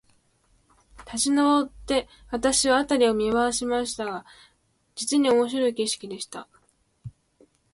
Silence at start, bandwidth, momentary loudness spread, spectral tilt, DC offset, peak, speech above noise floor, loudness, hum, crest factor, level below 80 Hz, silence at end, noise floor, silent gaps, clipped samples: 1 s; 11.5 kHz; 19 LU; -2.5 dB/octave; under 0.1%; -8 dBFS; 41 dB; -24 LUFS; none; 18 dB; -54 dBFS; 0.65 s; -65 dBFS; none; under 0.1%